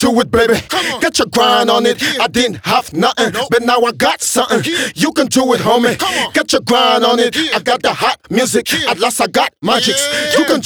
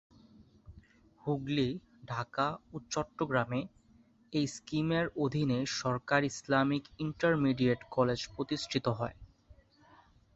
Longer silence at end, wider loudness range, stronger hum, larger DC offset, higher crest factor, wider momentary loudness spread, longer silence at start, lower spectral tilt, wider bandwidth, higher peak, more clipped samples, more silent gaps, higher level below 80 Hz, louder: second, 0 s vs 0.85 s; second, 1 LU vs 5 LU; neither; neither; second, 14 dB vs 22 dB; second, 4 LU vs 9 LU; second, 0 s vs 0.4 s; second, -3 dB/octave vs -5.5 dB/octave; first, over 20 kHz vs 8.2 kHz; first, 0 dBFS vs -12 dBFS; neither; neither; first, -46 dBFS vs -62 dBFS; first, -13 LUFS vs -33 LUFS